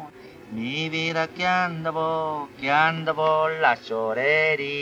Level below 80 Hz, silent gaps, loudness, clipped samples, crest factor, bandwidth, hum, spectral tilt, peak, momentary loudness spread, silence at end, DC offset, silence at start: -66 dBFS; none; -23 LUFS; under 0.1%; 18 dB; 11 kHz; none; -5 dB/octave; -6 dBFS; 9 LU; 0 s; under 0.1%; 0 s